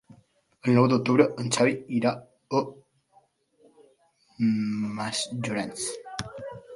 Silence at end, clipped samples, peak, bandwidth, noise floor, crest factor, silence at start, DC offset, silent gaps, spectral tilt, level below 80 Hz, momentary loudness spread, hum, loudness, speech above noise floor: 0 s; under 0.1%; -4 dBFS; 11.5 kHz; -64 dBFS; 22 dB; 0.65 s; under 0.1%; none; -5.5 dB/octave; -64 dBFS; 15 LU; none; -26 LUFS; 39 dB